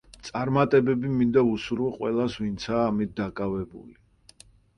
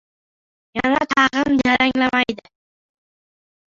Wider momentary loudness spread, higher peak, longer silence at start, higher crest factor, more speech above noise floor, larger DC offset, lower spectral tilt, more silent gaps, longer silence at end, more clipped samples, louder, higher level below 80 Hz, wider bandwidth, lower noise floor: about the same, 10 LU vs 8 LU; second, -8 dBFS vs -2 dBFS; second, 0.25 s vs 0.75 s; about the same, 18 dB vs 20 dB; second, 30 dB vs over 72 dB; neither; first, -7 dB/octave vs -4 dB/octave; neither; second, 0.85 s vs 1.35 s; neither; second, -25 LUFS vs -18 LUFS; about the same, -52 dBFS vs -52 dBFS; first, 11.5 kHz vs 7.6 kHz; second, -55 dBFS vs under -90 dBFS